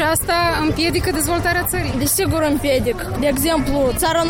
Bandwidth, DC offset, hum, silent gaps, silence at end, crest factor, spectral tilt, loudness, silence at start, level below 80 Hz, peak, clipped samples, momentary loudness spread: 17 kHz; under 0.1%; none; none; 0 s; 12 dB; -4 dB/octave; -18 LUFS; 0 s; -30 dBFS; -6 dBFS; under 0.1%; 3 LU